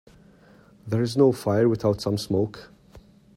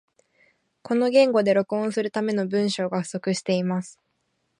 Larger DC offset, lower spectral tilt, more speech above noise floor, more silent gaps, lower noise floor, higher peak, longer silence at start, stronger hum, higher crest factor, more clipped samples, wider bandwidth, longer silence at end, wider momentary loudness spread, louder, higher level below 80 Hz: neither; first, -7 dB/octave vs -5.5 dB/octave; second, 31 dB vs 51 dB; neither; second, -53 dBFS vs -73 dBFS; about the same, -6 dBFS vs -6 dBFS; about the same, 0.85 s vs 0.85 s; neither; about the same, 18 dB vs 18 dB; neither; first, 15.5 kHz vs 11 kHz; second, 0.4 s vs 0.65 s; about the same, 9 LU vs 9 LU; about the same, -23 LUFS vs -23 LUFS; first, -56 dBFS vs -74 dBFS